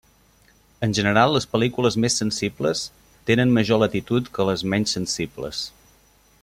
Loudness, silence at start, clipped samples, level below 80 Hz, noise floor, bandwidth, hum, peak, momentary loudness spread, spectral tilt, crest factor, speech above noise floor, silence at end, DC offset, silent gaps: -22 LUFS; 0.8 s; under 0.1%; -52 dBFS; -57 dBFS; 15.5 kHz; none; -4 dBFS; 11 LU; -4.5 dB/octave; 18 dB; 36 dB; 0.75 s; under 0.1%; none